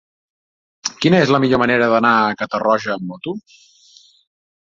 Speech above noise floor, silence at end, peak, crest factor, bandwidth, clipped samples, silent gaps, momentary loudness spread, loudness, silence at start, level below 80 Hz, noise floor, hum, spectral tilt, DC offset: 34 dB; 1.3 s; -2 dBFS; 18 dB; 7.8 kHz; under 0.1%; none; 14 LU; -16 LUFS; 0.85 s; -56 dBFS; -50 dBFS; none; -5.5 dB/octave; under 0.1%